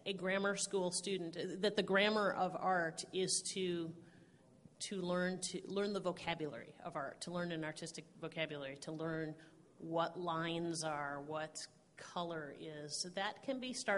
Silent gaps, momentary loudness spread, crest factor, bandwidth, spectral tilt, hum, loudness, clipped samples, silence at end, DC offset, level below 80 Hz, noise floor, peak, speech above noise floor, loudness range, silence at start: none; 12 LU; 22 dB; 11.5 kHz; -3.5 dB/octave; none; -40 LUFS; under 0.1%; 0 s; under 0.1%; -78 dBFS; -65 dBFS; -20 dBFS; 24 dB; 7 LU; 0 s